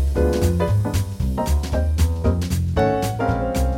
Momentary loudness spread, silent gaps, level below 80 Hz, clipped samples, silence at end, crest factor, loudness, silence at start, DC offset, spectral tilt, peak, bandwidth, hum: 4 LU; none; -24 dBFS; under 0.1%; 0 s; 14 dB; -21 LUFS; 0 s; under 0.1%; -7 dB/octave; -6 dBFS; 16.5 kHz; none